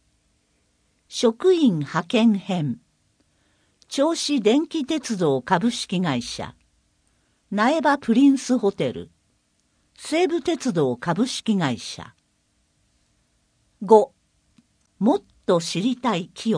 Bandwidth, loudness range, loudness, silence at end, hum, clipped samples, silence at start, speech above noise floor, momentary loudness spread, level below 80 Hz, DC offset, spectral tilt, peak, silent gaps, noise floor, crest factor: 10.5 kHz; 3 LU; -22 LUFS; 0 s; none; under 0.1%; 1.1 s; 47 dB; 14 LU; -64 dBFS; under 0.1%; -5.5 dB/octave; 0 dBFS; none; -67 dBFS; 22 dB